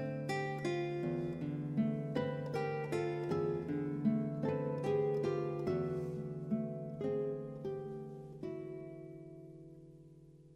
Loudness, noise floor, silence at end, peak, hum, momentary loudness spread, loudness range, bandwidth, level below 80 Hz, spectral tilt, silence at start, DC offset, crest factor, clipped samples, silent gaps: -38 LUFS; -58 dBFS; 0 s; -22 dBFS; none; 16 LU; 7 LU; 11 kHz; -68 dBFS; -8 dB/octave; 0 s; under 0.1%; 16 dB; under 0.1%; none